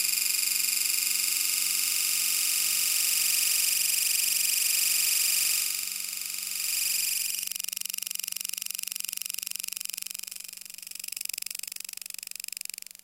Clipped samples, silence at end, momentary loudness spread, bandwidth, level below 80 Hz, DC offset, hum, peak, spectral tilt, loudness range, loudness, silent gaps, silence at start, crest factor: under 0.1%; 1.1 s; 14 LU; 17 kHz; -80 dBFS; under 0.1%; none; -8 dBFS; 4 dB/octave; 11 LU; -25 LUFS; none; 0 s; 20 dB